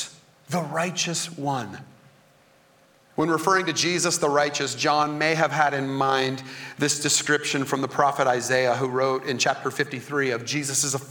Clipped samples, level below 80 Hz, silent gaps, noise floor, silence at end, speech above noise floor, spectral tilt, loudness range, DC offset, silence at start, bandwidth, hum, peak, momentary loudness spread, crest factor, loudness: under 0.1%; -70 dBFS; none; -58 dBFS; 0 s; 34 dB; -3 dB/octave; 4 LU; under 0.1%; 0 s; 19.5 kHz; none; -4 dBFS; 8 LU; 20 dB; -23 LUFS